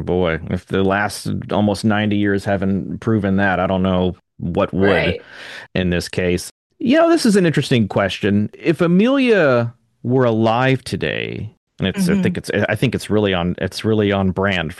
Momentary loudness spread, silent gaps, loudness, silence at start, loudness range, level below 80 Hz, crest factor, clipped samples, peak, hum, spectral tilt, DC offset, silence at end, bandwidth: 10 LU; 6.51-6.70 s, 11.57-11.67 s; -18 LUFS; 0 s; 3 LU; -48 dBFS; 16 dB; under 0.1%; -2 dBFS; none; -6.5 dB/octave; under 0.1%; 0.05 s; 12.5 kHz